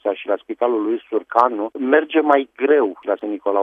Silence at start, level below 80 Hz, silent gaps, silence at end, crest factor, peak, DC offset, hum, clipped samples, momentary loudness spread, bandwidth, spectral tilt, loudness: 0.05 s; -72 dBFS; none; 0 s; 18 dB; 0 dBFS; under 0.1%; none; under 0.1%; 8 LU; 5.4 kHz; -6 dB/octave; -19 LUFS